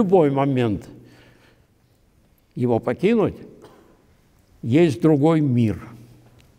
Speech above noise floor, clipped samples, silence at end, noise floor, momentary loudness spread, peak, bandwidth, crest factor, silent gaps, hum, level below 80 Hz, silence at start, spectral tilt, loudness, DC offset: 41 dB; under 0.1%; 0.65 s; -59 dBFS; 17 LU; -6 dBFS; 12 kHz; 16 dB; none; none; -54 dBFS; 0 s; -8.5 dB/octave; -20 LUFS; under 0.1%